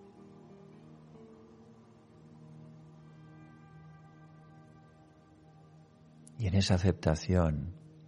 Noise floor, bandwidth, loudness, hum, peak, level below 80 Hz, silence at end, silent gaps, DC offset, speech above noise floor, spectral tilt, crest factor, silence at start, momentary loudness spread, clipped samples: -59 dBFS; 11 kHz; -31 LUFS; none; -12 dBFS; -50 dBFS; 0.2 s; none; under 0.1%; 30 dB; -6.5 dB/octave; 24 dB; 0.9 s; 27 LU; under 0.1%